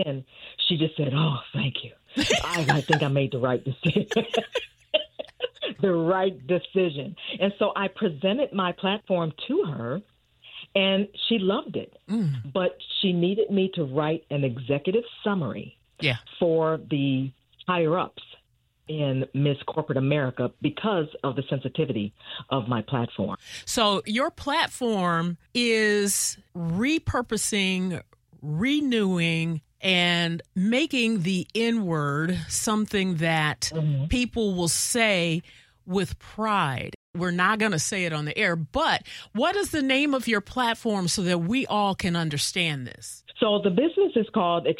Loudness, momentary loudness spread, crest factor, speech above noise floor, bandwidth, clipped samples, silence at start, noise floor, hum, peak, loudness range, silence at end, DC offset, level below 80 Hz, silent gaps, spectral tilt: -25 LUFS; 9 LU; 22 dB; 41 dB; 16 kHz; under 0.1%; 0 s; -66 dBFS; none; -4 dBFS; 3 LU; 0 s; under 0.1%; -52 dBFS; 36.95-37.14 s; -4.5 dB/octave